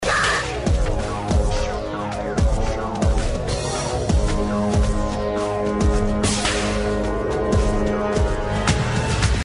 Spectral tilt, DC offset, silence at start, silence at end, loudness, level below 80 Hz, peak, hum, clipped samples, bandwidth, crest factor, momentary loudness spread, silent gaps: -5 dB/octave; under 0.1%; 0 s; 0 s; -22 LUFS; -24 dBFS; -4 dBFS; none; under 0.1%; 11 kHz; 16 dB; 4 LU; none